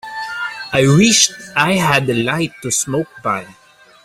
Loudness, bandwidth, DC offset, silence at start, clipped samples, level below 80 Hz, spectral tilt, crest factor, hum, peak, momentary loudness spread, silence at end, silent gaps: -15 LUFS; 16 kHz; under 0.1%; 0.05 s; under 0.1%; -50 dBFS; -3.5 dB/octave; 16 dB; none; 0 dBFS; 13 LU; 0.5 s; none